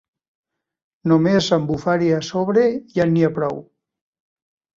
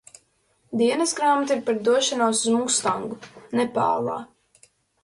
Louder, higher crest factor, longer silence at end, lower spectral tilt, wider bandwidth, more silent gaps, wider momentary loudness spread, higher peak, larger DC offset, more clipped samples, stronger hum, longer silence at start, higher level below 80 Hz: first, -19 LUFS vs -22 LUFS; about the same, 16 dB vs 16 dB; first, 1.15 s vs 0.8 s; first, -6.5 dB/octave vs -3 dB/octave; second, 7.6 kHz vs 11.5 kHz; neither; about the same, 9 LU vs 10 LU; first, -4 dBFS vs -8 dBFS; neither; neither; neither; first, 1.05 s vs 0.7 s; first, -56 dBFS vs -68 dBFS